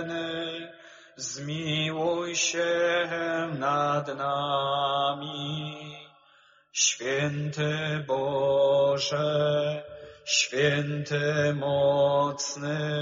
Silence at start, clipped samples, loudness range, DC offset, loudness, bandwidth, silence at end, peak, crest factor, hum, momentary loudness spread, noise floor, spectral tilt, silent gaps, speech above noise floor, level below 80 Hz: 0 s; under 0.1%; 3 LU; under 0.1%; -27 LUFS; 7.4 kHz; 0 s; -8 dBFS; 18 dB; none; 11 LU; -60 dBFS; -3.5 dB/octave; none; 34 dB; -66 dBFS